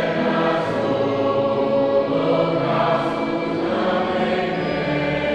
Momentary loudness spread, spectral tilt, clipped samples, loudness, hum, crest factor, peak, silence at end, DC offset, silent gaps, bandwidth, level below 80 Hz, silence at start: 3 LU; -7 dB/octave; under 0.1%; -20 LUFS; none; 14 dB; -6 dBFS; 0 s; under 0.1%; none; 8.8 kHz; -50 dBFS; 0 s